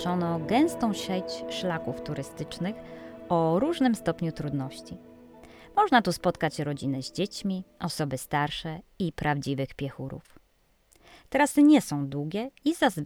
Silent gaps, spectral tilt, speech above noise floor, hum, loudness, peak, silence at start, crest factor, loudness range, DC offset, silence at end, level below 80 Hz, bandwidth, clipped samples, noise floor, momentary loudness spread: none; -5.5 dB/octave; 39 dB; none; -28 LUFS; -8 dBFS; 0 s; 20 dB; 5 LU; under 0.1%; 0 s; -56 dBFS; 17 kHz; under 0.1%; -66 dBFS; 14 LU